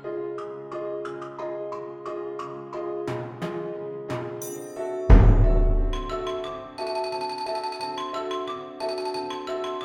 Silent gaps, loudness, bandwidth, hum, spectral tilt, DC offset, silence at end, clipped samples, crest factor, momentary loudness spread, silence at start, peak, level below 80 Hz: none; -28 LUFS; 17 kHz; none; -6.5 dB/octave; under 0.1%; 0 s; under 0.1%; 24 dB; 13 LU; 0 s; 0 dBFS; -28 dBFS